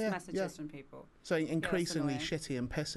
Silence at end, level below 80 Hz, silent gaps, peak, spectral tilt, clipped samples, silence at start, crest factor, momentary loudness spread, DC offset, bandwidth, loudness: 0 s; -58 dBFS; none; -20 dBFS; -5 dB/octave; under 0.1%; 0 s; 16 dB; 15 LU; under 0.1%; 12 kHz; -35 LUFS